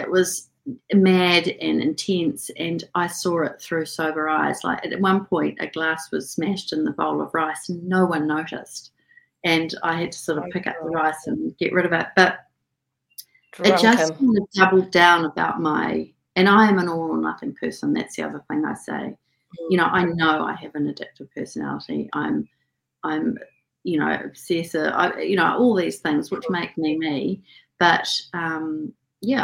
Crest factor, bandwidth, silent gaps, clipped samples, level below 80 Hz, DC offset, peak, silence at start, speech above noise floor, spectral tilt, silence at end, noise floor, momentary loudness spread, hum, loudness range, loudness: 22 dB; 16.5 kHz; none; under 0.1%; -62 dBFS; under 0.1%; 0 dBFS; 0 s; 57 dB; -5 dB/octave; 0 s; -79 dBFS; 14 LU; none; 7 LU; -22 LUFS